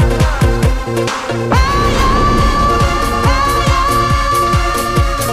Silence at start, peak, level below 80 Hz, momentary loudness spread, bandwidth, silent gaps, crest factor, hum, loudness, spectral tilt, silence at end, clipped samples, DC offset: 0 s; 0 dBFS; -18 dBFS; 3 LU; 16 kHz; none; 12 dB; none; -13 LUFS; -5 dB/octave; 0 s; under 0.1%; under 0.1%